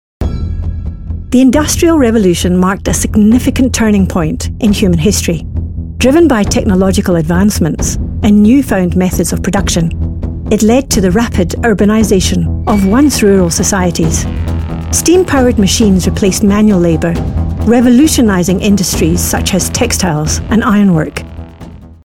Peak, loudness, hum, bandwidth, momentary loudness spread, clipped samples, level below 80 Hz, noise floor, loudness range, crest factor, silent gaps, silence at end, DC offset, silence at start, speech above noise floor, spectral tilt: 0 dBFS; -10 LUFS; none; 17 kHz; 10 LU; under 0.1%; -22 dBFS; -31 dBFS; 2 LU; 10 dB; none; 0.1 s; 0.4%; 0.2 s; 22 dB; -5 dB/octave